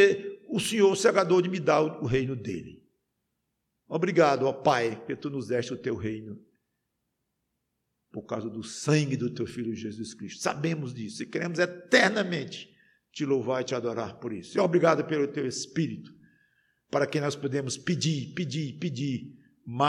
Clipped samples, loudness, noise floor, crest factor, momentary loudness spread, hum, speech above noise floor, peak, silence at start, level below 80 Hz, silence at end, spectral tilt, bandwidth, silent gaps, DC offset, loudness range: under 0.1%; -28 LUFS; -80 dBFS; 22 dB; 14 LU; none; 53 dB; -6 dBFS; 0 s; -64 dBFS; 0 s; -5 dB/octave; 13 kHz; none; under 0.1%; 6 LU